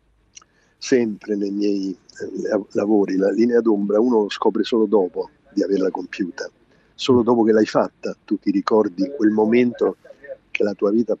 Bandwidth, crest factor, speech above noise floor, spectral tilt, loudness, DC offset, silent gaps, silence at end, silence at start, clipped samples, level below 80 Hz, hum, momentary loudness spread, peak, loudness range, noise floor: 8 kHz; 18 dB; 31 dB; -6 dB/octave; -20 LUFS; under 0.1%; none; 0.05 s; 0.8 s; under 0.1%; -64 dBFS; none; 13 LU; -2 dBFS; 3 LU; -50 dBFS